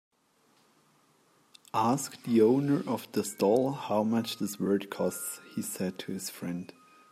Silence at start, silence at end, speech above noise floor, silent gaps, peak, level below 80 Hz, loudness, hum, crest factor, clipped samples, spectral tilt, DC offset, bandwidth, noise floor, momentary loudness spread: 1.75 s; 0.45 s; 39 dB; none; -12 dBFS; -76 dBFS; -30 LUFS; none; 18 dB; under 0.1%; -5.5 dB/octave; under 0.1%; 16 kHz; -68 dBFS; 12 LU